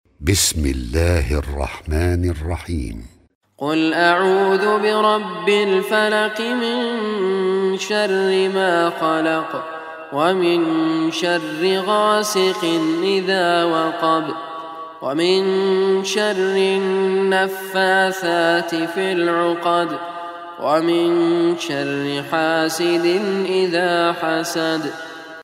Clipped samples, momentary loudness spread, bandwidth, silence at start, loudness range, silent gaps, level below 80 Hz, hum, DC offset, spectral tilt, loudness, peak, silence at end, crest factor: under 0.1%; 10 LU; 16 kHz; 0.2 s; 2 LU; 3.35-3.41 s; -36 dBFS; none; under 0.1%; -4.5 dB/octave; -18 LUFS; 0 dBFS; 0 s; 18 dB